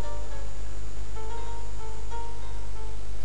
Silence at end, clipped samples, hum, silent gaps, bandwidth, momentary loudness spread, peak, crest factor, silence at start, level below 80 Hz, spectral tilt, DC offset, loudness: 0 s; under 0.1%; 50 Hz at -35 dBFS; none; 10.5 kHz; 2 LU; -16 dBFS; 12 dB; 0 s; -36 dBFS; -5 dB/octave; 10%; -39 LUFS